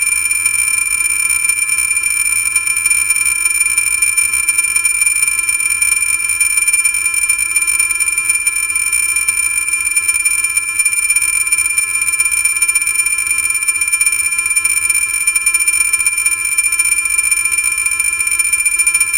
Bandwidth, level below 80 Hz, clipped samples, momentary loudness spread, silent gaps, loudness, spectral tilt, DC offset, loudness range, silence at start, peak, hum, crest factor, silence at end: 19 kHz; -44 dBFS; under 0.1%; 2 LU; none; -11 LUFS; 3 dB/octave; 0.1%; 1 LU; 0 s; 0 dBFS; none; 14 dB; 0 s